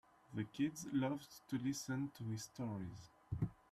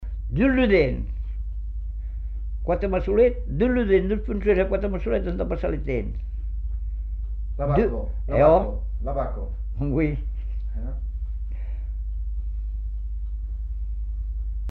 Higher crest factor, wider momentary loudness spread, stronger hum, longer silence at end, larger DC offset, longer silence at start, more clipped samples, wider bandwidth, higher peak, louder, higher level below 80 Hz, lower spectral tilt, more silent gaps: about the same, 16 dB vs 18 dB; second, 9 LU vs 13 LU; second, none vs 50 Hz at -30 dBFS; first, 0.2 s vs 0 s; neither; first, 0.3 s vs 0 s; neither; first, 13 kHz vs 4.4 kHz; second, -26 dBFS vs -6 dBFS; second, -44 LUFS vs -26 LUFS; second, -66 dBFS vs -28 dBFS; second, -6 dB/octave vs -10 dB/octave; neither